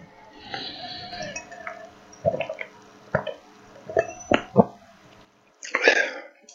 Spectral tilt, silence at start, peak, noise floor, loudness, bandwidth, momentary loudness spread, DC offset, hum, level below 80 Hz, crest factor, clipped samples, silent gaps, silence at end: -4.5 dB/octave; 0 s; 0 dBFS; -55 dBFS; -26 LUFS; 7.8 kHz; 21 LU; under 0.1%; none; -58 dBFS; 28 dB; under 0.1%; none; 0 s